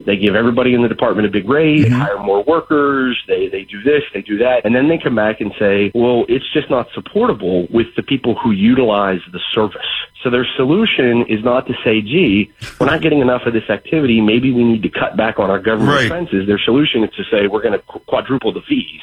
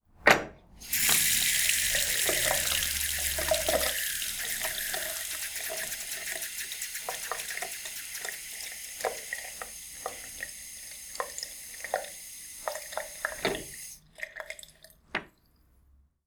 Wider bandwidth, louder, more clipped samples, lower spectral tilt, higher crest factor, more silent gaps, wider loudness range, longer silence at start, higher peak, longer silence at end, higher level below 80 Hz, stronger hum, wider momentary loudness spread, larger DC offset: second, 10 kHz vs over 20 kHz; first, -15 LUFS vs -29 LUFS; neither; first, -7 dB/octave vs 0 dB/octave; second, 14 dB vs 30 dB; neither; second, 2 LU vs 13 LU; second, 0 s vs 0.2 s; about the same, -2 dBFS vs -4 dBFS; second, 0 s vs 1 s; first, -44 dBFS vs -54 dBFS; neither; second, 6 LU vs 17 LU; neither